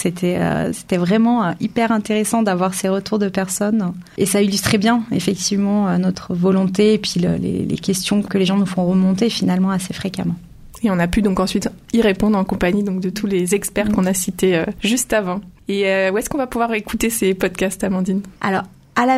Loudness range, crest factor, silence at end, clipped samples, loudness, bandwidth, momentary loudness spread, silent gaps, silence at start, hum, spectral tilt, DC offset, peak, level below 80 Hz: 2 LU; 18 dB; 0 s; under 0.1%; -18 LUFS; 15.5 kHz; 6 LU; none; 0 s; none; -5 dB/octave; under 0.1%; 0 dBFS; -42 dBFS